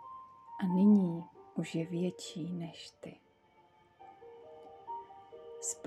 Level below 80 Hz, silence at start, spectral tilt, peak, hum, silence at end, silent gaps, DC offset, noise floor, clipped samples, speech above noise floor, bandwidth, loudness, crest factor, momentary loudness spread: -80 dBFS; 0 s; -6 dB/octave; -18 dBFS; none; 0.05 s; none; under 0.1%; -66 dBFS; under 0.1%; 27 dB; 12 kHz; -34 LUFS; 18 dB; 26 LU